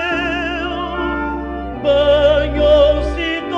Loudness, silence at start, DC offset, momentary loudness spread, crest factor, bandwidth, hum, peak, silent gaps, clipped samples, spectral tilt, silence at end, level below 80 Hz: -16 LUFS; 0 s; under 0.1%; 10 LU; 14 dB; 7.6 kHz; none; -2 dBFS; none; under 0.1%; -6.5 dB/octave; 0 s; -28 dBFS